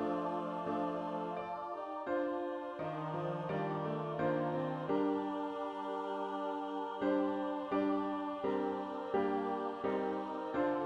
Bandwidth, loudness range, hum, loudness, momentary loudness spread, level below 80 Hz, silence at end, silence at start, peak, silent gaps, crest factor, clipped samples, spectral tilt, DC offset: 7.8 kHz; 3 LU; none; -37 LUFS; 6 LU; -74 dBFS; 0 s; 0 s; -20 dBFS; none; 16 dB; under 0.1%; -8 dB/octave; under 0.1%